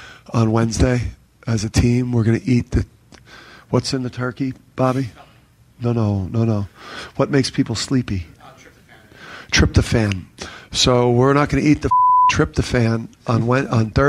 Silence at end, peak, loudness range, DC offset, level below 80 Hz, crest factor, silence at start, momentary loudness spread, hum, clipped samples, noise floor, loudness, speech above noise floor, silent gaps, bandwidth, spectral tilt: 0 s; -2 dBFS; 7 LU; under 0.1%; -34 dBFS; 16 dB; 0 s; 13 LU; none; under 0.1%; -51 dBFS; -18 LUFS; 33 dB; none; 12 kHz; -5.5 dB/octave